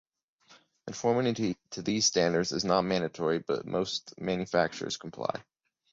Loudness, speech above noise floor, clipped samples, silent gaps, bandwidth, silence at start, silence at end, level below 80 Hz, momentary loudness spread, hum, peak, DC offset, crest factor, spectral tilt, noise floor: -30 LUFS; 32 dB; under 0.1%; none; 8 kHz; 0.5 s; 0.5 s; -64 dBFS; 10 LU; none; -12 dBFS; under 0.1%; 20 dB; -4 dB/octave; -61 dBFS